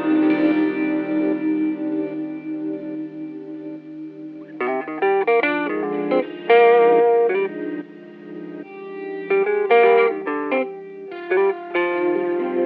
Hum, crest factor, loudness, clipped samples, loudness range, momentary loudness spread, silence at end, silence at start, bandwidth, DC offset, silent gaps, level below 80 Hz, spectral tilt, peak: none; 16 dB; -20 LUFS; under 0.1%; 8 LU; 20 LU; 0 s; 0 s; 4.8 kHz; under 0.1%; none; under -90 dBFS; -8.5 dB/octave; -4 dBFS